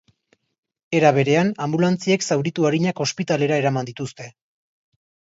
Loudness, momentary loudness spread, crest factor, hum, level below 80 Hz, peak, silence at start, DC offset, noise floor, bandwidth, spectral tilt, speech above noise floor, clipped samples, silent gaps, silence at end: -20 LUFS; 14 LU; 20 dB; none; -64 dBFS; -2 dBFS; 0.9 s; under 0.1%; -65 dBFS; 8 kHz; -5.5 dB/octave; 45 dB; under 0.1%; none; 1.1 s